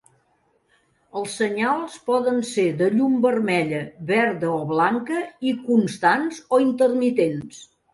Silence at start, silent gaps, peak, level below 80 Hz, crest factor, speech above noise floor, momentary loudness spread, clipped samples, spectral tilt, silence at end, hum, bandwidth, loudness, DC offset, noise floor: 1.15 s; none; -4 dBFS; -66 dBFS; 16 dB; 44 dB; 8 LU; under 0.1%; -5.5 dB/octave; 0.3 s; none; 11.5 kHz; -21 LUFS; under 0.1%; -65 dBFS